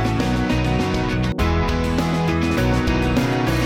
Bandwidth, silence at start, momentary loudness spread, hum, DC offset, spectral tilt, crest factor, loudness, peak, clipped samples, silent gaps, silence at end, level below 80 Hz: 16.5 kHz; 0 s; 2 LU; none; 0.2%; -6.5 dB/octave; 12 dB; -20 LUFS; -8 dBFS; under 0.1%; none; 0 s; -28 dBFS